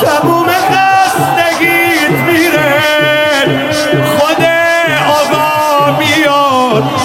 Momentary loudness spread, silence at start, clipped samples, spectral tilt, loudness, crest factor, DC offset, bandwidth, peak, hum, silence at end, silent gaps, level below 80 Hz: 2 LU; 0 s; under 0.1%; -4 dB/octave; -9 LUFS; 10 dB; under 0.1%; 17 kHz; 0 dBFS; none; 0 s; none; -48 dBFS